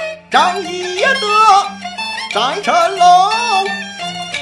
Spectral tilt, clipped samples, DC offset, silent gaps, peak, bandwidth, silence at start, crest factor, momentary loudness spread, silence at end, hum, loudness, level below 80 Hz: -2 dB/octave; under 0.1%; under 0.1%; none; 0 dBFS; 12 kHz; 0 s; 14 dB; 13 LU; 0 s; none; -13 LUFS; -60 dBFS